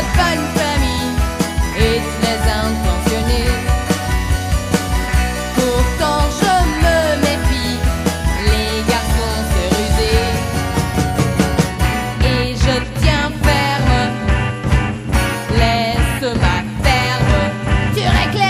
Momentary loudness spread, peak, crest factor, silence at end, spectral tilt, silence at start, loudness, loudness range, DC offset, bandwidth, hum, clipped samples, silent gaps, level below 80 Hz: 4 LU; 0 dBFS; 16 dB; 0 s; -5 dB/octave; 0 s; -16 LUFS; 1 LU; under 0.1%; 15.5 kHz; none; under 0.1%; none; -20 dBFS